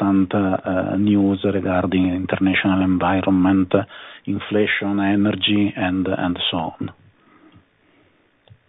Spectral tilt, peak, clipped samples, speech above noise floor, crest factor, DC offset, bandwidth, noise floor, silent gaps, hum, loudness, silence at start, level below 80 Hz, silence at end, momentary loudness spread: -9 dB/octave; -2 dBFS; under 0.1%; 39 dB; 18 dB; under 0.1%; 4 kHz; -58 dBFS; none; none; -19 LUFS; 0 s; -54 dBFS; 1.75 s; 9 LU